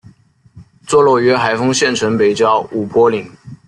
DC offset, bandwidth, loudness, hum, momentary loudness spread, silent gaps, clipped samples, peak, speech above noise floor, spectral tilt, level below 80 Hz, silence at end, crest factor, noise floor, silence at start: under 0.1%; 11.5 kHz; -13 LUFS; none; 6 LU; none; under 0.1%; -2 dBFS; 34 dB; -4.5 dB/octave; -54 dBFS; 0.15 s; 14 dB; -47 dBFS; 0.55 s